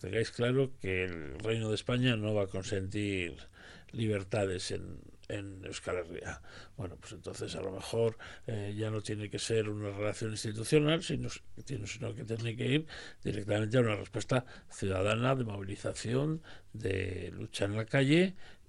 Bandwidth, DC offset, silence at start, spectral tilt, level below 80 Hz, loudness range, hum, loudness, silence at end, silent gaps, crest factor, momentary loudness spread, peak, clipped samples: 12 kHz; under 0.1%; 0 s; -5.5 dB/octave; -58 dBFS; 6 LU; none; -34 LUFS; 0.05 s; none; 20 dB; 14 LU; -14 dBFS; under 0.1%